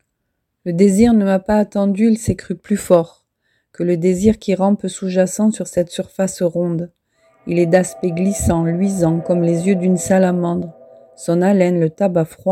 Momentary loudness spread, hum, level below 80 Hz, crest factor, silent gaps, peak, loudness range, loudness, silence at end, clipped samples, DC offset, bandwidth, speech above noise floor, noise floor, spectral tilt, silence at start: 9 LU; none; -42 dBFS; 16 dB; none; 0 dBFS; 3 LU; -17 LUFS; 0 s; under 0.1%; under 0.1%; 15 kHz; 57 dB; -73 dBFS; -7 dB/octave; 0.65 s